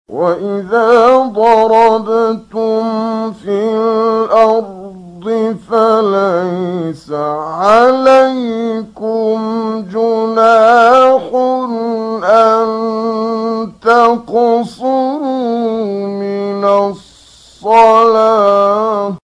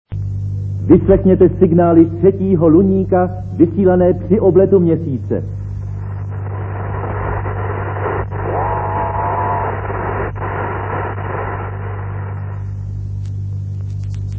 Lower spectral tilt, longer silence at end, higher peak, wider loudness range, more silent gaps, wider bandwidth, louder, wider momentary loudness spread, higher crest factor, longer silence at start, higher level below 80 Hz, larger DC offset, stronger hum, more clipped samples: second, -6 dB/octave vs -11.5 dB/octave; about the same, 0.05 s vs 0 s; about the same, 0 dBFS vs 0 dBFS; second, 4 LU vs 11 LU; neither; first, 10.5 kHz vs 3.3 kHz; first, -12 LUFS vs -16 LUFS; second, 11 LU vs 14 LU; about the same, 12 dB vs 16 dB; about the same, 0.1 s vs 0.1 s; second, -54 dBFS vs -30 dBFS; second, under 0.1% vs 0.4%; second, none vs 50 Hz at -40 dBFS; first, 0.3% vs under 0.1%